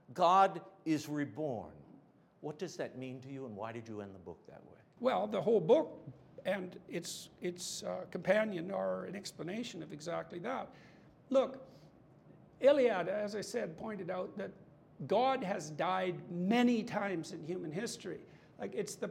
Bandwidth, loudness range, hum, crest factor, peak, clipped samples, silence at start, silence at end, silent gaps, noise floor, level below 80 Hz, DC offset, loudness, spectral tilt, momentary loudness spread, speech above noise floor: 16 kHz; 7 LU; none; 20 dB; -16 dBFS; under 0.1%; 0.1 s; 0 s; none; -63 dBFS; -78 dBFS; under 0.1%; -36 LUFS; -5 dB/octave; 17 LU; 27 dB